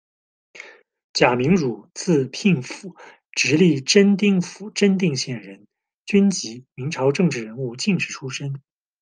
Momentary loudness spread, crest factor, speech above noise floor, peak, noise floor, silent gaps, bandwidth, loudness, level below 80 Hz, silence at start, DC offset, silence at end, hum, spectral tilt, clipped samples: 18 LU; 20 dB; 24 dB; -2 dBFS; -44 dBFS; 1.04-1.14 s, 5.94-6.05 s; 10 kHz; -20 LUFS; -60 dBFS; 0.55 s; under 0.1%; 0.4 s; none; -5 dB/octave; under 0.1%